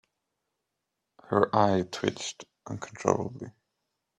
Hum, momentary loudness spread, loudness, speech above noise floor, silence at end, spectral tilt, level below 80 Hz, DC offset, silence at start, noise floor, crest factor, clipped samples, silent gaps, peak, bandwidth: none; 19 LU; -28 LUFS; 56 dB; 0.7 s; -5.5 dB/octave; -68 dBFS; under 0.1%; 1.3 s; -84 dBFS; 24 dB; under 0.1%; none; -6 dBFS; 12 kHz